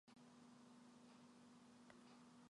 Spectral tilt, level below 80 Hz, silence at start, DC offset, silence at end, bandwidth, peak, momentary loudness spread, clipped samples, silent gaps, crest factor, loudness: -4.5 dB/octave; under -90 dBFS; 0.05 s; under 0.1%; 0 s; 11 kHz; -48 dBFS; 1 LU; under 0.1%; none; 18 dB; -67 LUFS